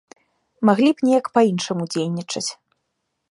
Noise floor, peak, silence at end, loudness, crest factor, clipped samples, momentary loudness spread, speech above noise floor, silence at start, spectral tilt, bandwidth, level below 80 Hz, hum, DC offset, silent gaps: -76 dBFS; -2 dBFS; 0.75 s; -20 LUFS; 18 dB; under 0.1%; 10 LU; 57 dB; 0.6 s; -5 dB/octave; 11.5 kHz; -70 dBFS; none; under 0.1%; none